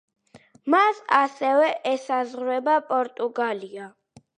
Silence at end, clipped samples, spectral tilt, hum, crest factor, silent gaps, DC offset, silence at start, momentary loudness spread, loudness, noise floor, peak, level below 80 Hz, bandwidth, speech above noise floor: 0.5 s; under 0.1%; -4 dB/octave; none; 20 dB; none; under 0.1%; 0.35 s; 15 LU; -23 LUFS; -54 dBFS; -4 dBFS; -80 dBFS; 10 kHz; 31 dB